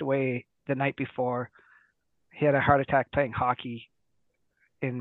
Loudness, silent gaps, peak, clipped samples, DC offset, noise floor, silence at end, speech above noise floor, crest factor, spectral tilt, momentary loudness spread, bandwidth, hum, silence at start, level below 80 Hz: -28 LUFS; none; -6 dBFS; under 0.1%; under 0.1%; -77 dBFS; 0 s; 50 dB; 22 dB; -10 dB/octave; 13 LU; 4.1 kHz; none; 0 s; -56 dBFS